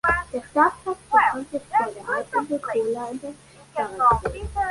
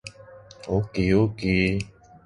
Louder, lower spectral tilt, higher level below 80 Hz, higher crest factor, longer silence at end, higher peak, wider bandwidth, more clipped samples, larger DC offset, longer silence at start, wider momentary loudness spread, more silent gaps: about the same, -23 LUFS vs -24 LUFS; second, -5.5 dB/octave vs -7 dB/octave; about the same, -44 dBFS vs -42 dBFS; about the same, 18 dB vs 18 dB; second, 0 s vs 0.4 s; about the same, -6 dBFS vs -8 dBFS; about the same, 11.5 kHz vs 11 kHz; neither; neither; about the same, 0.05 s vs 0.05 s; second, 12 LU vs 18 LU; neither